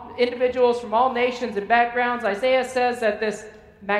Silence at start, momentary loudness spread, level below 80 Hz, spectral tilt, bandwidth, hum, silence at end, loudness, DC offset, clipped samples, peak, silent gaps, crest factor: 0 s; 8 LU; -58 dBFS; -4 dB/octave; 11.5 kHz; none; 0 s; -22 LUFS; under 0.1%; under 0.1%; -4 dBFS; none; 18 dB